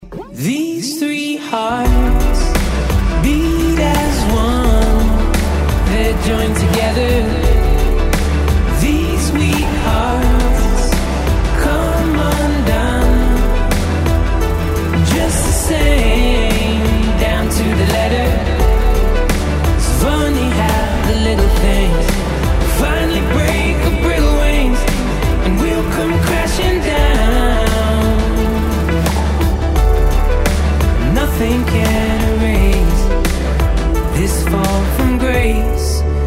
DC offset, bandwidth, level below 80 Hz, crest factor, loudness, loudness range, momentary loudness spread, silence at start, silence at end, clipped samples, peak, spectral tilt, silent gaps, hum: under 0.1%; 16 kHz; -14 dBFS; 12 dB; -15 LUFS; 1 LU; 3 LU; 0 s; 0 s; under 0.1%; 0 dBFS; -5.5 dB/octave; none; none